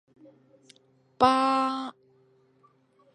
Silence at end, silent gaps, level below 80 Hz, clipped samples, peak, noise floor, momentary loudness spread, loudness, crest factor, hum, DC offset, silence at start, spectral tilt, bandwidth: 1.25 s; none; -64 dBFS; under 0.1%; -6 dBFS; -64 dBFS; 14 LU; -24 LUFS; 24 dB; none; under 0.1%; 1.2 s; -4.5 dB/octave; 10.5 kHz